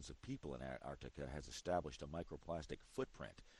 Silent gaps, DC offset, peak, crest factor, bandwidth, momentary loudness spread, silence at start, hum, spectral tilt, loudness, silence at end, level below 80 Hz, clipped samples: none; under 0.1%; -28 dBFS; 22 dB; 11.5 kHz; 8 LU; 0 s; none; -5.5 dB/octave; -49 LUFS; 0 s; -60 dBFS; under 0.1%